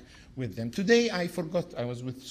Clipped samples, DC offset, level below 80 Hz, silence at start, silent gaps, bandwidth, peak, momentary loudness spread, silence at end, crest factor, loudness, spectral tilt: under 0.1%; under 0.1%; -60 dBFS; 0 s; none; 15.5 kHz; -10 dBFS; 14 LU; 0 s; 20 dB; -29 LUFS; -5 dB/octave